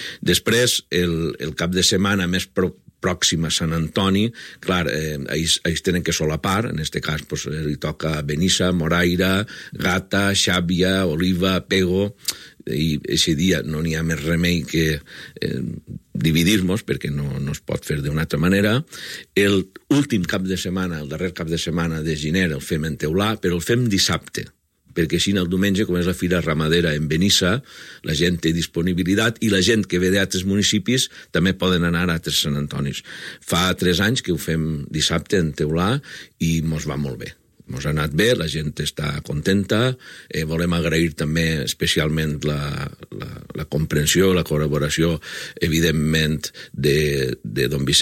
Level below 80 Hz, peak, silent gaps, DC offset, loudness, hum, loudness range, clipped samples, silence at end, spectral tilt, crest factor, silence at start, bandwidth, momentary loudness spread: -40 dBFS; -4 dBFS; none; under 0.1%; -20 LUFS; none; 3 LU; under 0.1%; 0 s; -4.5 dB/octave; 16 dB; 0 s; 16.5 kHz; 10 LU